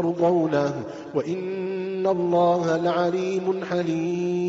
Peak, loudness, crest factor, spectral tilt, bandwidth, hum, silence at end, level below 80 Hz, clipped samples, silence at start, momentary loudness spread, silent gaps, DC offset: -10 dBFS; -24 LUFS; 14 dB; -6 dB/octave; 7.8 kHz; none; 0 s; -64 dBFS; under 0.1%; 0 s; 8 LU; none; under 0.1%